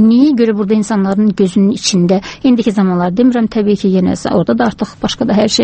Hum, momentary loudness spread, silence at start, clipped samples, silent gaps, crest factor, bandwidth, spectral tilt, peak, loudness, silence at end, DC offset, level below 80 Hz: none; 3 LU; 0 s; under 0.1%; none; 12 dB; 8.8 kHz; -6 dB/octave; 0 dBFS; -12 LUFS; 0 s; under 0.1%; -44 dBFS